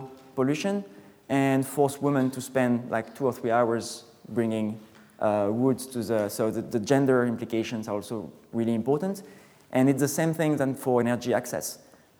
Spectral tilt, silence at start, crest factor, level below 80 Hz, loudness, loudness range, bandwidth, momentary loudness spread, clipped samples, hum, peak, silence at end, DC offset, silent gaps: -6 dB/octave; 0 s; 18 dB; -70 dBFS; -27 LUFS; 2 LU; over 20 kHz; 10 LU; under 0.1%; none; -8 dBFS; 0.45 s; under 0.1%; none